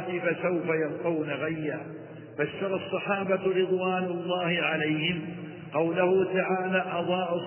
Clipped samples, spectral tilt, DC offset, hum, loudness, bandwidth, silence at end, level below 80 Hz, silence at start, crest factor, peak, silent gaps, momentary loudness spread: under 0.1%; -10 dB/octave; under 0.1%; none; -28 LUFS; 3.2 kHz; 0 s; -68 dBFS; 0 s; 16 dB; -12 dBFS; none; 9 LU